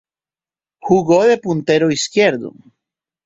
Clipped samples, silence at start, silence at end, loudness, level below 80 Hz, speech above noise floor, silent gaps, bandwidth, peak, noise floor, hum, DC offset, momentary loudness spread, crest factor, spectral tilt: under 0.1%; 0.85 s; 0.75 s; -15 LUFS; -56 dBFS; over 75 dB; none; 8 kHz; -2 dBFS; under -90 dBFS; none; under 0.1%; 14 LU; 16 dB; -5 dB/octave